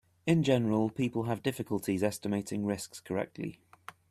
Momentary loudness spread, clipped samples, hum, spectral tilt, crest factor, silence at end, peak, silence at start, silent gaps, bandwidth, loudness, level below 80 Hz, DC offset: 14 LU; under 0.1%; none; -6 dB/octave; 18 dB; 0.55 s; -14 dBFS; 0.25 s; none; 14 kHz; -32 LUFS; -66 dBFS; under 0.1%